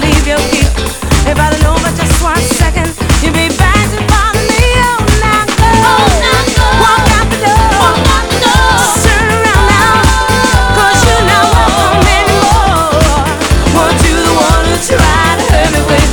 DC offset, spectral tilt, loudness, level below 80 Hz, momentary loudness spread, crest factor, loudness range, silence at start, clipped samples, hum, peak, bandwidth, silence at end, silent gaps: under 0.1%; -4 dB/octave; -8 LUFS; -14 dBFS; 4 LU; 8 dB; 2 LU; 0 s; 0.7%; none; 0 dBFS; 19.5 kHz; 0 s; none